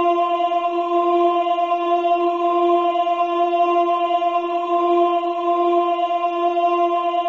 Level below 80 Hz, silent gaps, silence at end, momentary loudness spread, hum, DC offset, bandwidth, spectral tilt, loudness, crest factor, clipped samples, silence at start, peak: -78 dBFS; none; 0 s; 3 LU; none; under 0.1%; 7 kHz; 0 dB/octave; -19 LUFS; 10 dB; under 0.1%; 0 s; -8 dBFS